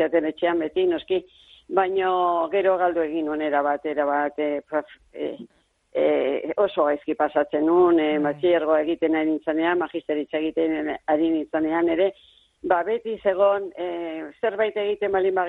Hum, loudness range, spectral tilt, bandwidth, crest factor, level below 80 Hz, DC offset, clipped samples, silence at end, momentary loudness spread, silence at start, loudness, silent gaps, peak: none; 4 LU; -7.5 dB/octave; 4.1 kHz; 16 dB; -62 dBFS; under 0.1%; under 0.1%; 0 s; 8 LU; 0 s; -23 LUFS; none; -6 dBFS